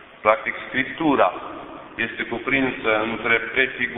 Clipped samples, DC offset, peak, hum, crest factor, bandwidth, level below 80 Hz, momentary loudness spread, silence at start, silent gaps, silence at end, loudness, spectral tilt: under 0.1%; under 0.1%; 0 dBFS; none; 22 dB; 4.1 kHz; -54 dBFS; 11 LU; 0 s; none; 0 s; -21 LUFS; -8 dB/octave